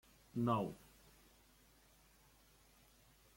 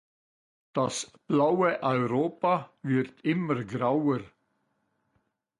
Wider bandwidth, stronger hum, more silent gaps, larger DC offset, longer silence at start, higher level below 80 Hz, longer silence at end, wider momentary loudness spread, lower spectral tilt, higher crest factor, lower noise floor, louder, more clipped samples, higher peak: first, 16.5 kHz vs 11.5 kHz; neither; neither; neither; second, 0.35 s vs 0.75 s; about the same, -72 dBFS vs -68 dBFS; first, 2.6 s vs 1.3 s; first, 27 LU vs 6 LU; first, -7.5 dB/octave vs -6 dB/octave; first, 22 dB vs 16 dB; second, -69 dBFS vs -75 dBFS; second, -40 LUFS vs -28 LUFS; neither; second, -24 dBFS vs -12 dBFS